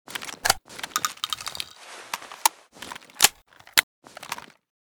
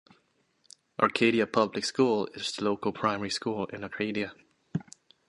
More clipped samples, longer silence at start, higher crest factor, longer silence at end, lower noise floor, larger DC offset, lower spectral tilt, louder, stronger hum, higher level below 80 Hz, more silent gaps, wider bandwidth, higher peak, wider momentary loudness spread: neither; second, 0.1 s vs 1 s; first, 30 dB vs 24 dB; about the same, 0.55 s vs 0.45 s; second, -46 dBFS vs -70 dBFS; neither; second, 1 dB/octave vs -4.5 dB/octave; first, -25 LUFS vs -29 LUFS; neither; first, -60 dBFS vs -66 dBFS; first, 3.83-4.02 s vs none; first, over 20 kHz vs 11.5 kHz; first, 0 dBFS vs -6 dBFS; first, 20 LU vs 13 LU